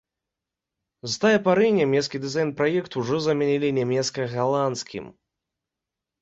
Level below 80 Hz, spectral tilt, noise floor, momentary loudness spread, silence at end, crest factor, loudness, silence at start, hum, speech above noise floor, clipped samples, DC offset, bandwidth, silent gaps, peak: -64 dBFS; -5 dB/octave; -86 dBFS; 11 LU; 1.1 s; 18 dB; -23 LUFS; 1.05 s; none; 64 dB; under 0.1%; under 0.1%; 8 kHz; none; -6 dBFS